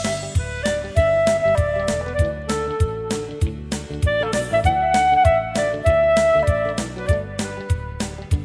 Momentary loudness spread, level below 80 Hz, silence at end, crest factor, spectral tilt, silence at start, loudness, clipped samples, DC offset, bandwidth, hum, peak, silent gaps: 10 LU; -30 dBFS; 0 s; 16 dB; -5.5 dB/octave; 0 s; -20 LUFS; under 0.1%; under 0.1%; 11 kHz; none; -4 dBFS; none